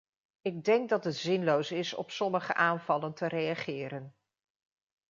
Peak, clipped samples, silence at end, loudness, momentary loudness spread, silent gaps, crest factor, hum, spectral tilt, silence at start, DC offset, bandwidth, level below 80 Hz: -10 dBFS; under 0.1%; 1 s; -31 LUFS; 10 LU; none; 22 dB; none; -5.5 dB/octave; 0.45 s; under 0.1%; 7.6 kHz; -80 dBFS